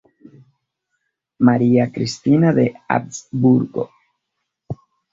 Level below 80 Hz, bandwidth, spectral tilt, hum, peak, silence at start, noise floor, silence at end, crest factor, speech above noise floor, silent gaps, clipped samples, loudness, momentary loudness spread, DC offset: -56 dBFS; 7.6 kHz; -7 dB/octave; none; -2 dBFS; 1.4 s; -77 dBFS; 0.4 s; 18 dB; 61 dB; none; under 0.1%; -17 LUFS; 19 LU; under 0.1%